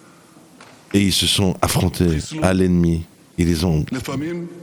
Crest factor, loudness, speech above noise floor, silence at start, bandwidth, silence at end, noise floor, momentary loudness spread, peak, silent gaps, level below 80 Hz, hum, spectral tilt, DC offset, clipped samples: 20 dB; -19 LUFS; 29 dB; 0.6 s; 19 kHz; 0 s; -47 dBFS; 10 LU; 0 dBFS; none; -38 dBFS; none; -5 dB/octave; under 0.1%; under 0.1%